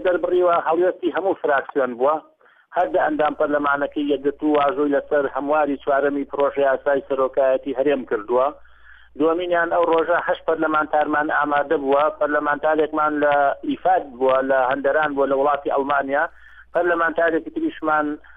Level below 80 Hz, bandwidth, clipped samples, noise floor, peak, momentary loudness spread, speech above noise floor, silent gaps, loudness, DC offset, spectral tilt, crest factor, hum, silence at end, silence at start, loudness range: -56 dBFS; 3.9 kHz; under 0.1%; -46 dBFS; -8 dBFS; 4 LU; 26 dB; none; -20 LUFS; under 0.1%; -7.5 dB/octave; 12 dB; none; 0.05 s; 0 s; 2 LU